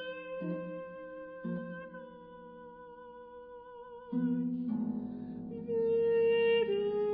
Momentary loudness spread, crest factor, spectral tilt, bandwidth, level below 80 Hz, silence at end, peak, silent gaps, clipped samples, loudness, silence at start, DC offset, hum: 22 LU; 14 dB; -9.5 dB/octave; 4.4 kHz; -70 dBFS; 0 s; -20 dBFS; none; under 0.1%; -33 LUFS; 0 s; under 0.1%; none